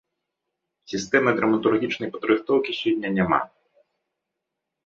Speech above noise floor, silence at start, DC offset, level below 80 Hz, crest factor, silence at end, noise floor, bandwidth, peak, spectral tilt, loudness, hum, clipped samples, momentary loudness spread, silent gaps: 61 dB; 0.9 s; under 0.1%; -60 dBFS; 22 dB; 1.4 s; -83 dBFS; 7.6 kHz; -4 dBFS; -5.5 dB/octave; -23 LUFS; none; under 0.1%; 8 LU; none